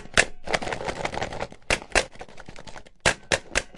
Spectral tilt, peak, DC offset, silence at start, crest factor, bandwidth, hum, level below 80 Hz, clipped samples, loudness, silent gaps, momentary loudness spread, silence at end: -2 dB/octave; -2 dBFS; under 0.1%; 0 s; 26 dB; 11.5 kHz; none; -40 dBFS; under 0.1%; -26 LUFS; none; 21 LU; 0 s